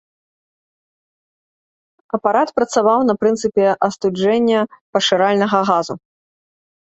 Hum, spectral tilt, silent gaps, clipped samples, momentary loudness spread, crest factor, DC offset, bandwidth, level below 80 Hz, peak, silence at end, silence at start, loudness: none; -4.5 dB/octave; 4.81-4.93 s; under 0.1%; 6 LU; 16 dB; under 0.1%; 8.2 kHz; -60 dBFS; -2 dBFS; 0.85 s; 2.15 s; -16 LUFS